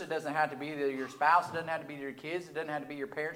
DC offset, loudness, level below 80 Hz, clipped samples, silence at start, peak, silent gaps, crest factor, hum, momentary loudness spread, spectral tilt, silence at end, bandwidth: under 0.1%; -33 LUFS; -80 dBFS; under 0.1%; 0 s; -12 dBFS; none; 20 dB; none; 12 LU; -5 dB/octave; 0 s; 17.5 kHz